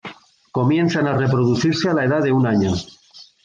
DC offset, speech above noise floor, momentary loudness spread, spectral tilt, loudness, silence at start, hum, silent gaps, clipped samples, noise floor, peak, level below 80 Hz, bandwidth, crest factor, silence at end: under 0.1%; 22 dB; 10 LU; -6.5 dB/octave; -18 LUFS; 0.05 s; none; none; under 0.1%; -39 dBFS; -6 dBFS; -44 dBFS; 7.6 kHz; 12 dB; 0.2 s